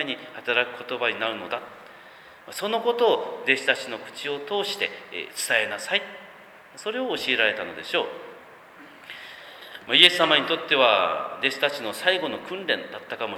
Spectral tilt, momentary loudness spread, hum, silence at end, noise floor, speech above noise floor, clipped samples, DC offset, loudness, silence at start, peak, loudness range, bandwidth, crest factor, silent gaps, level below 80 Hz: -2 dB/octave; 20 LU; none; 0 s; -48 dBFS; 23 dB; under 0.1%; under 0.1%; -23 LUFS; 0 s; 0 dBFS; 7 LU; 19.5 kHz; 26 dB; none; -72 dBFS